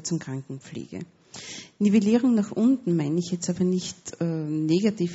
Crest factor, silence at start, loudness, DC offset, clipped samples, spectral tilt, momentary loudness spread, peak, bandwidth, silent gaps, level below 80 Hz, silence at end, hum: 16 dB; 0 s; -24 LUFS; under 0.1%; under 0.1%; -7.5 dB/octave; 17 LU; -10 dBFS; 8 kHz; none; -66 dBFS; 0 s; none